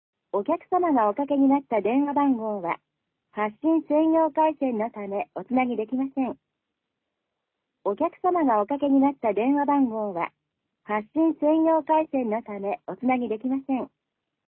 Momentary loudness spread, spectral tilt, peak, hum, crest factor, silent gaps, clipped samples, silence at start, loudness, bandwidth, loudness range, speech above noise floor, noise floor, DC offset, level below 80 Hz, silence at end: 10 LU; -10.5 dB/octave; -10 dBFS; none; 14 dB; none; under 0.1%; 0.35 s; -25 LUFS; 3.5 kHz; 4 LU; 59 dB; -82 dBFS; under 0.1%; -68 dBFS; 0.7 s